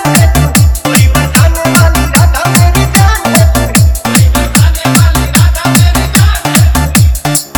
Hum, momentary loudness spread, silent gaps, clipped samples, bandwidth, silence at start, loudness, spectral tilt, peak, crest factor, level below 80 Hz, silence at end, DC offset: none; 1 LU; none; 2%; over 20 kHz; 0 s; -7 LUFS; -4.5 dB/octave; 0 dBFS; 6 dB; -12 dBFS; 0 s; under 0.1%